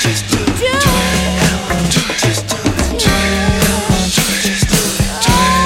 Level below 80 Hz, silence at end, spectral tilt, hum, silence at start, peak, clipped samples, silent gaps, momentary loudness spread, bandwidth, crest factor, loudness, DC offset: -24 dBFS; 0 s; -3.5 dB/octave; none; 0 s; 0 dBFS; under 0.1%; none; 4 LU; 17 kHz; 14 dB; -13 LUFS; under 0.1%